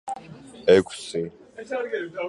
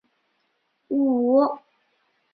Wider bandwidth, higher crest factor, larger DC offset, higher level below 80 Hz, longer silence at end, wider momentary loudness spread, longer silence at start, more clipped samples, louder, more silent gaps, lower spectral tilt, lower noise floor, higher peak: first, 11.5 kHz vs 4.8 kHz; about the same, 20 dB vs 16 dB; neither; first, -58 dBFS vs -74 dBFS; second, 0 s vs 0.75 s; first, 20 LU vs 10 LU; second, 0.05 s vs 0.9 s; neither; about the same, -24 LUFS vs -22 LUFS; neither; second, -5 dB/octave vs -10 dB/octave; second, -43 dBFS vs -72 dBFS; first, -4 dBFS vs -8 dBFS